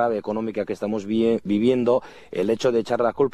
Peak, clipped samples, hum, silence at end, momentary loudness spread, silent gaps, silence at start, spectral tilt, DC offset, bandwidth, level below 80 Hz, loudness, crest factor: -8 dBFS; under 0.1%; none; 0.05 s; 7 LU; none; 0 s; -6.5 dB/octave; under 0.1%; 11 kHz; -60 dBFS; -23 LUFS; 14 dB